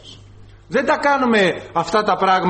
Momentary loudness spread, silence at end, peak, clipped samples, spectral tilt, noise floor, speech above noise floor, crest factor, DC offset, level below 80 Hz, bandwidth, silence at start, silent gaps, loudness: 7 LU; 0 s; -4 dBFS; under 0.1%; -5 dB/octave; -43 dBFS; 26 dB; 14 dB; under 0.1%; -50 dBFS; 8.8 kHz; 0.05 s; none; -17 LUFS